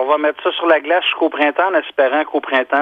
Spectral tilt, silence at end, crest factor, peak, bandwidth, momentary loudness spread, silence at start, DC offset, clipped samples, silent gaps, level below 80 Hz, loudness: -4 dB/octave; 0 s; 16 dB; 0 dBFS; 5.2 kHz; 4 LU; 0 s; under 0.1%; under 0.1%; none; -70 dBFS; -16 LUFS